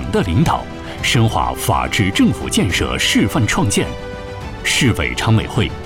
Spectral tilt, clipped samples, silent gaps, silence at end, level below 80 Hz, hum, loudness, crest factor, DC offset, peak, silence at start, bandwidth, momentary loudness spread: -4.5 dB/octave; under 0.1%; none; 0 s; -32 dBFS; none; -16 LUFS; 12 dB; under 0.1%; -4 dBFS; 0 s; 17 kHz; 9 LU